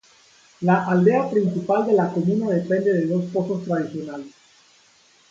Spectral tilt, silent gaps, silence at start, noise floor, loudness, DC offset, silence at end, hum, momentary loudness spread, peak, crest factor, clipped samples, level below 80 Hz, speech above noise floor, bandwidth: -8.5 dB/octave; none; 0.6 s; -56 dBFS; -21 LUFS; under 0.1%; 1 s; none; 9 LU; -4 dBFS; 18 dB; under 0.1%; -66 dBFS; 36 dB; 7.6 kHz